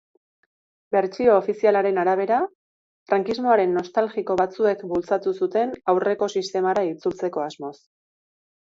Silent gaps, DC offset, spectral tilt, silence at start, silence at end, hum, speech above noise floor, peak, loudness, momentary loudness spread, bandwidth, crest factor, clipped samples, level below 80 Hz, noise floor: 2.55-3.06 s; under 0.1%; -6 dB/octave; 0.9 s; 0.95 s; none; over 68 dB; -4 dBFS; -22 LUFS; 8 LU; 7.8 kHz; 18 dB; under 0.1%; -64 dBFS; under -90 dBFS